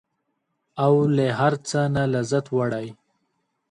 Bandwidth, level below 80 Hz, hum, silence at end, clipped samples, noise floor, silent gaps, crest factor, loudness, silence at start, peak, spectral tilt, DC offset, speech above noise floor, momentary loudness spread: 11 kHz; -58 dBFS; none; 0.75 s; under 0.1%; -75 dBFS; none; 18 dB; -22 LUFS; 0.75 s; -6 dBFS; -6.5 dB/octave; under 0.1%; 54 dB; 11 LU